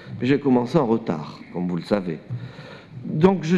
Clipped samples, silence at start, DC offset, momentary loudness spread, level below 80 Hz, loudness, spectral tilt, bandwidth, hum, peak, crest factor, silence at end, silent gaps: under 0.1%; 0 s; under 0.1%; 17 LU; -56 dBFS; -23 LUFS; -8 dB/octave; 9.6 kHz; none; -4 dBFS; 18 dB; 0 s; none